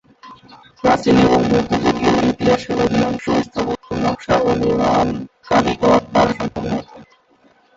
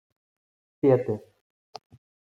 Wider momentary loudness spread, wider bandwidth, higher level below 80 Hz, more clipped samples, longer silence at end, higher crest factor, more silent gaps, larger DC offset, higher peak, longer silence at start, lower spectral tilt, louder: second, 9 LU vs 25 LU; first, 7.8 kHz vs 6.6 kHz; first, -40 dBFS vs -74 dBFS; neither; second, 0.75 s vs 1.15 s; second, 16 dB vs 22 dB; neither; neither; first, -2 dBFS vs -8 dBFS; second, 0.25 s vs 0.85 s; second, -6 dB/octave vs -9.5 dB/octave; first, -17 LUFS vs -25 LUFS